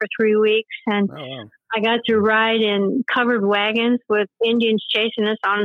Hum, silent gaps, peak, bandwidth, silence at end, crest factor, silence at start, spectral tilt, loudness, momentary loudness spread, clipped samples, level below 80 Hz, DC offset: none; none; -6 dBFS; 5 kHz; 0 s; 14 dB; 0 s; -7 dB/octave; -19 LUFS; 7 LU; under 0.1%; -68 dBFS; under 0.1%